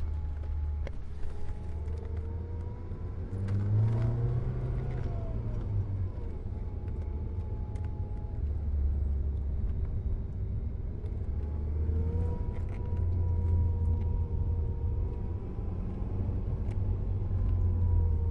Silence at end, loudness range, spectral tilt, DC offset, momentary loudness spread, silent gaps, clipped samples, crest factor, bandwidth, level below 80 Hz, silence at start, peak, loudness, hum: 0 s; 4 LU; -10.5 dB/octave; under 0.1%; 9 LU; none; under 0.1%; 14 dB; 3.4 kHz; -34 dBFS; 0 s; -18 dBFS; -34 LUFS; none